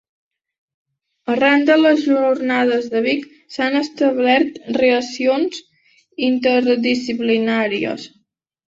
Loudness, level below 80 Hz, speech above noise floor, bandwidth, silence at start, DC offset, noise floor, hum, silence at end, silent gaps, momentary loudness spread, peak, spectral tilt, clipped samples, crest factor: -17 LUFS; -64 dBFS; 51 dB; 7.8 kHz; 1.25 s; under 0.1%; -68 dBFS; none; 0.6 s; none; 10 LU; -2 dBFS; -4.5 dB/octave; under 0.1%; 16 dB